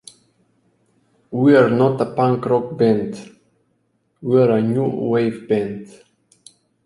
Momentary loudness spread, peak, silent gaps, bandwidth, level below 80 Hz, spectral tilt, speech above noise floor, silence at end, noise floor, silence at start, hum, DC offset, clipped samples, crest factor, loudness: 16 LU; -2 dBFS; none; 11.5 kHz; -60 dBFS; -8 dB/octave; 49 dB; 1 s; -66 dBFS; 1.3 s; none; under 0.1%; under 0.1%; 18 dB; -18 LUFS